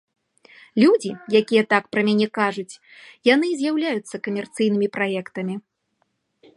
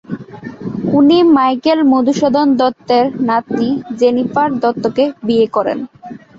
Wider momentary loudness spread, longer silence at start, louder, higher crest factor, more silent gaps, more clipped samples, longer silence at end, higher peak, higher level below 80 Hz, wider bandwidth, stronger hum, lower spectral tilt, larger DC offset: second, 12 LU vs 15 LU; first, 0.75 s vs 0.1 s; second, -21 LUFS vs -13 LUFS; first, 20 dB vs 12 dB; neither; neither; first, 0.95 s vs 0.2 s; about the same, -2 dBFS vs -2 dBFS; second, -74 dBFS vs -54 dBFS; first, 11.5 kHz vs 7.6 kHz; neither; about the same, -5.5 dB/octave vs -6.5 dB/octave; neither